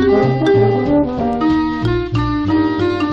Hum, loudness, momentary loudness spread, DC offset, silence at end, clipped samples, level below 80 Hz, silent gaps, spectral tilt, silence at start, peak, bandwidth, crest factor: none; -15 LUFS; 5 LU; under 0.1%; 0 s; under 0.1%; -32 dBFS; none; -8.5 dB/octave; 0 s; -2 dBFS; 7.2 kHz; 12 dB